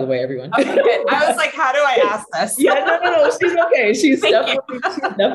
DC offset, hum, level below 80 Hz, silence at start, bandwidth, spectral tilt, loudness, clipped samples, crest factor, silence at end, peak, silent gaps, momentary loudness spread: under 0.1%; none; -64 dBFS; 0 s; 13 kHz; -3 dB/octave; -16 LUFS; under 0.1%; 12 dB; 0 s; -4 dBFS; none; 6 LU